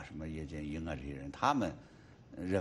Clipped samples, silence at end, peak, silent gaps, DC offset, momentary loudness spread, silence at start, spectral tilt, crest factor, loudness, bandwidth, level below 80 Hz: under 0.1%; 0 s; -14 dBFS; none; under 0.1%; 20 LU; 0 s; -6 dB/octave; 24 dB; -38 LUFS; 12 kHz; -54 dBFS